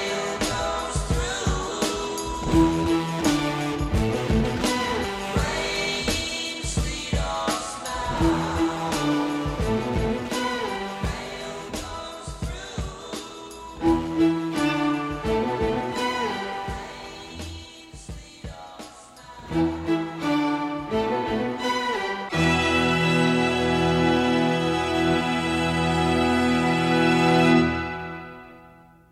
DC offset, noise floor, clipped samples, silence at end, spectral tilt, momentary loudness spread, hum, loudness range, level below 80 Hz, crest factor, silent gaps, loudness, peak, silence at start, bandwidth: under 0.1%; -50 dBFS; under 0.1%; 0.4 s; -5 dB/octave; 16 LU; none; 9 LU; -38 dBFS; 18 dB; none; -24 LUFS; -8 dBFS; 0 s; 15 kHz